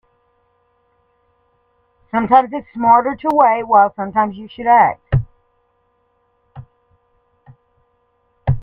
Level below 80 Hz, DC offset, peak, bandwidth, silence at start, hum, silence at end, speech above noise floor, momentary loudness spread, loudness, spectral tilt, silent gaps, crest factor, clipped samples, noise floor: -40 dBFS; under 0.1%; 0 dBFS; 4.8 kHz; 2.15 s; none; 0 s; 49 dB; 11 LU; -15 LUFS; -9.5 dB/octave; none; 18 dB; under 0.1%; -63 dBFS